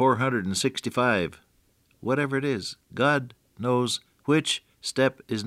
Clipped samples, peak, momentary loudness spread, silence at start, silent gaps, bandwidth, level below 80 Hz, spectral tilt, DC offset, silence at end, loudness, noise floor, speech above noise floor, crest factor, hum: under 0.1%; -8 dBFS; 8 LU; 0 s; none; 15.5 kHz; -66 dBFS; -4.5 dB/octave; under 0.1%; 0 s; -26 LUFS; -65 dBFS; 40 dB; 18 dB; none